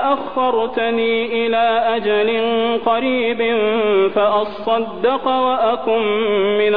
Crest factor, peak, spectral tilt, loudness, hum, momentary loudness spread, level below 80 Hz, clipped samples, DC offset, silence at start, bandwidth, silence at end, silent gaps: 12 dB; -4 dBFS; -7.5 dB/octave; -17 LUFS; none; 3 LU; -54 dBFS; under 0.1%; 1%; 0 s; 5 kHz; 0 s; none